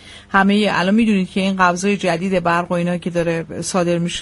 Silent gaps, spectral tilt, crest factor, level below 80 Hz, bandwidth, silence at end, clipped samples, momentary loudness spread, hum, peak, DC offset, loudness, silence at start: none; -5.5 dB/octave; 16 dB; -48 dBFS; 11.5 kHz; 0 s; under 0.1%; 5 LU; none; 0 dBFS; under 0.1%; -17 LUFS; 0.05 s